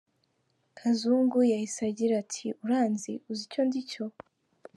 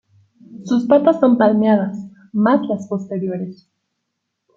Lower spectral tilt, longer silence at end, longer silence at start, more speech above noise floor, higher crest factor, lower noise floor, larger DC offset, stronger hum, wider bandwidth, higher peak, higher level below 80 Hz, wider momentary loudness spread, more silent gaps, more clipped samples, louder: second, -5 dB/octave vs -8 dB/octave; second, 0.65 s vs 1.05 s; first, 0.75 s vs 0.5 s; second, 46 dB vs 60 dB; about the same, 16 dB vs 16 dB; about the same, -74 dBFS vs -76 dBFS; neither; neither; first, 11.5 kHz vs 7.2 kHz; second, -14 dBFS vs -2 dBFS; second, -82 dBFS vs -64 dBFS; second, 11 LU vs 14 LU; neither; neither; second, -29 LUFS vs -17 LUFS